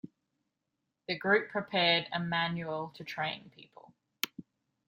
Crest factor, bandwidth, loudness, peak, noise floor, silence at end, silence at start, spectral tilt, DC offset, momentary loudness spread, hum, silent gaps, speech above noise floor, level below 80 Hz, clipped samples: 26 dB; 15.5 kHz; -32 LUFS; -8 dBFS; -85 dBFS; 0.45 s; 0.05 s; -4.5 dB/octave; under 0.1%; 13 LU; none; none; 52 dB; -76 dBFS; under 0.1%